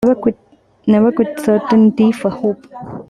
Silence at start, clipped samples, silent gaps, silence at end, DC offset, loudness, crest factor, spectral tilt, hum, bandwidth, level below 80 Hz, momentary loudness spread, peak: 0 s; under 0.1%; none; 0.05 s; under 0.1%; -14 LUFS; 12 dB; -8 dB/octave; none; 12.5 kHz; -52 dBFS; 14 LU; -2 dBFS